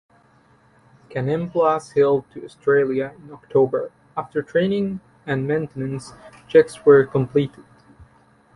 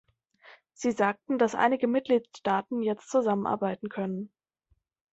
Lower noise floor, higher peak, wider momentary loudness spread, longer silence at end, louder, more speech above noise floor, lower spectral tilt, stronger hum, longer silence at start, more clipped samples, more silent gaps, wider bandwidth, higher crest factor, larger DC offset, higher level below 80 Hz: second, -56 dBFS vs -72 dBFS; first, -2 dBFS vs -10 dBFS; first, 16 LU vs 9 LU; second, 0.5 s vs 0.85 s; first, -20 LUFS vs -28 LUFS; second, 36 dB vs 45 dB; first, -7.5 dB/octave vs -6 dB/octave; neither; first, 1.1 s vs 0.8 s; neither; neither; first, 11.5 kHz vs 8.2 kHz; about the same, 20 dB vs 18 dB; neither; first, -58 dBFS vs -72 dBFS